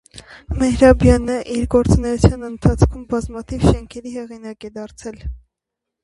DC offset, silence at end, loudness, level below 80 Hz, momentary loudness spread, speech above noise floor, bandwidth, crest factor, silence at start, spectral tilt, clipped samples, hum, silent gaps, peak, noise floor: under 0.1%; 0.65 s; -17 LUFS; -26 dBFS; 20 LU; 65 dB; 11.5 kHz; 18 dB; 0.15 s; -7 dB/octave; under 0.1%; none; none; 0 dBFS; -82 dBFS